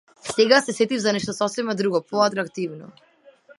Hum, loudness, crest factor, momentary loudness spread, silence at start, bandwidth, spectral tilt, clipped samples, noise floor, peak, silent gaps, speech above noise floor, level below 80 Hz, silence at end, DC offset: none; -22 LUFS; 22 dB; 12 LU; 0.25 s; 11.5 kHz; -4 dB/octave; under 0.1%; -52 dBFS; -2 dBFS; none; 30 dB; -68 dBFS; 0.05 s; under 0.1%